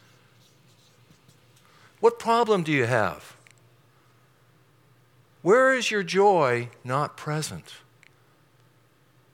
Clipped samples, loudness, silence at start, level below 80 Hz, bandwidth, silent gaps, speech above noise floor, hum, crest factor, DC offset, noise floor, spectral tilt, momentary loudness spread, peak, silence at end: under 0.1%; -23 LUFS; 2 s; -72 dBFS; 16.5 kHz; none; 38 dB; none; 20 dB; under 0.1%; -61 dBFS; -5 dB/octave; 11 LU; -6 dBFS; 1.55 s